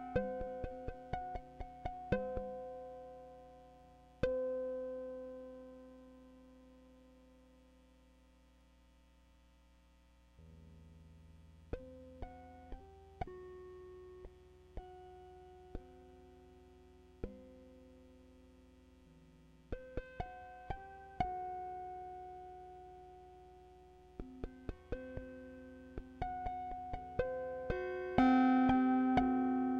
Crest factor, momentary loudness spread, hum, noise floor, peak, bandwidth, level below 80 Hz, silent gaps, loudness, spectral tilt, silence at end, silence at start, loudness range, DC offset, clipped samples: 24 dB; 27 LU; none; -66 dBFS; -18 dBFS; 6.4 kHz; -56 dBFS; none; -39 LUFS; -8 dB/octave; 0 s; 0 s; 20 LU; under 0.1%; under 0.1%